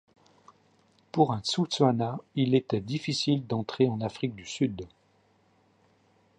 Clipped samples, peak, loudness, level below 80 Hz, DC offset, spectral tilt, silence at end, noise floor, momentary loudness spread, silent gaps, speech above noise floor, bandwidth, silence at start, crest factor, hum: under 0.1%; -8 dBFS; -28 LUFS; -64 dBFS; under 0.1%; -6 dB/octave; 1.5 s; -66 dBFS; 9 LU; none; 38 dB; 10 kHz; 1.15 s; 20 dB; none